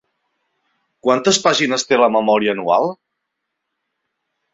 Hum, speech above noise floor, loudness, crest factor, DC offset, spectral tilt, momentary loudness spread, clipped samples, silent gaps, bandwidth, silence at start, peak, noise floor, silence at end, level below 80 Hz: none; 61 dB; -16 LUFS; 18 dB; under 0.1%; -3 dB/octave; 4 LU; under 0.1%; none; 8 kHz; 1.05 s; 0 dBFS; -77 dBFS; 1.6 s; -64 dBFS